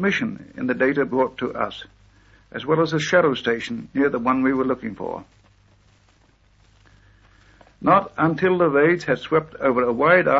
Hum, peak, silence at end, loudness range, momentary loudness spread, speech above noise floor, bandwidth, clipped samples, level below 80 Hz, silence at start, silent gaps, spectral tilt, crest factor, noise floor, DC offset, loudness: 50 Hz at -55 dBFS; -2 dBFS; 0 s; 6 LU; 12 LU; 37 dB; 8 kHz; under 0.1%; -56 dBFS; 0 s; none; -6 dB/octave; 20 dB; -57 dBFS; under 0.1%; -21 LUFS